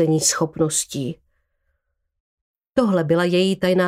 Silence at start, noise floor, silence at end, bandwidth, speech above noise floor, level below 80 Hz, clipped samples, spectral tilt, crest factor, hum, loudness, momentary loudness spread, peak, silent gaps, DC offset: 0 s; -73 dBFS; 0 s; 16 kHz; 54 dB; -56 dBFS; under 0.1%; -4.5 dB/octave; 16 dB; none; -20 LUFS; 11 LU; -4 dBFS; 2.20-2.54 s; under 0.1%